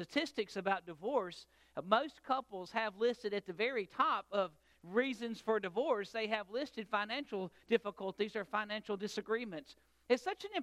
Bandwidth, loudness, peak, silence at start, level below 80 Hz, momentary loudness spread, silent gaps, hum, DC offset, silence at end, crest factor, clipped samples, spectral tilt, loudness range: 13.5 kHz; -38 LUFS; -14 dBFS; 0 s; -78 dBFS; 7 LU; none; none; under 0.1%; 0 s; 24 dB; under 0.1%; -4.5 dB/octave; 2 LU